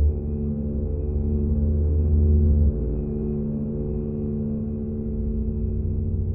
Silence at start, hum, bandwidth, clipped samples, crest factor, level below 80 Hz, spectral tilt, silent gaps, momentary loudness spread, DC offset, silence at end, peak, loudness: 0 s; none; 1.4 kHz; under 0.1%; 12 dB; -26 dBFS; -16.5 dB/octave; none; 8 LU; under 0.1%; 0 s; -10 dBFS; -25 LUFS